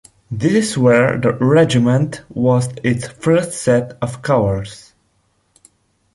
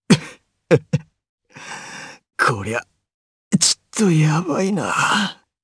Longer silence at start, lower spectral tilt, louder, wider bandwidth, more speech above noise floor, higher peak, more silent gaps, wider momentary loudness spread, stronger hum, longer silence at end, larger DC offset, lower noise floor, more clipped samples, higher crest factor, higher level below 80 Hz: first, 0.3 s vs 0.1 s; first, -6.5 dB/octave vs -4 dB/octave; first, -16 LUFS vs -19 LUFS; about the same, 11.5 kHz vs 11 kHz; first, 47 dB vs 23 dB; about the same, -2 dBFS vs 0 dBFS; second, none vs 1.29-1.38 s, 3.14-3.51 s; second, 11 LU vs 18 LU; neither; first, 1.4 s vs 0.3 s; neither; first, -62 dBFS vs -41 dBFS; neither; second, 14 dB vs 20 dB; first, -46 dBFS vs -60 dBFS